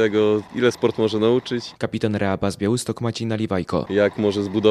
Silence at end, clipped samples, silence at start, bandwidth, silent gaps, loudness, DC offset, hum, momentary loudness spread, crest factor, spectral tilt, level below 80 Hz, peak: 0 s; under 0.1%; 0 s; 14 kHz; none; -22 LUFS; under 0.1%; none; 6 LU; 18 dB; -6 dB/octave; -54 dBFS; -2 dBFS